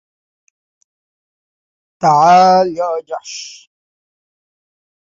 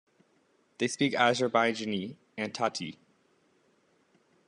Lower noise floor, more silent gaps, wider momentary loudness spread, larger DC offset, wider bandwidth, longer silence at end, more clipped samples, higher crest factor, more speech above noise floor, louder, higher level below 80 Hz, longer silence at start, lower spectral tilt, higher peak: first, under -90 dBFS vs -69 dBFS; neither; first, 20 LU vs 13 LU; neither; second, 7.6 kHz vs 11 kHz; about the same, 1.55 s vs 1.55 s; neither; second, 16 dB vs 24 dB; first, over 78 dB vs 40 dB; first, -12 LUFS vs -29 LUFS; first, -62 dBFS vs -78 dBFS; first, 2 s vs 0.8 s; about the same, -4.5 dB/octave vs -4 dB/octave; first, -2 dBFS vs -10 dBFS